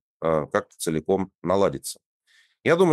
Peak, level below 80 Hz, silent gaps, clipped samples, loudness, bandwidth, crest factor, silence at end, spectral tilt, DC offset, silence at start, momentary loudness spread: -6 dBFS; -56 dBFS; 1.35-1.39 s, 2.06-2.20 s; under 0.1%; -25 LUFS; 15 kHz; 18 dB; 0 s; -5.5 dB/octave; under 0.1%; 0.2 s; 10 LU